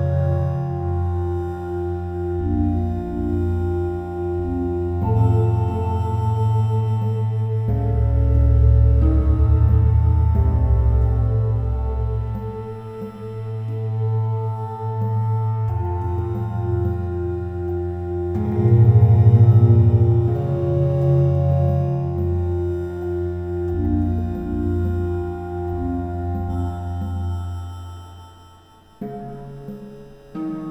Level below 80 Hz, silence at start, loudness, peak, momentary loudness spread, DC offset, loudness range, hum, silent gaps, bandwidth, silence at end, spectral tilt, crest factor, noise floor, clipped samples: -26 dBFS; 0 s; -20 LUFS; -2 dBFS; 14 LU; under 0.1%; 10 LU; none; none; 3.8 kHz; 0 s; -11 dB/octave; 16 dB; -48 dBFS; under 0.1%